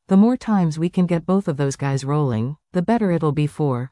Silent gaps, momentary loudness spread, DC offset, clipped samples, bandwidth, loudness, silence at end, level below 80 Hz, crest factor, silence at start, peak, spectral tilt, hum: none; 6 LU; under 0.1%; under 0.1%; 11.5 kHz; -20 LUFS; 0.05 s; -54 dBFS; 12 dB; 0.1 s; -6 dBFS; -8 dB/octave; none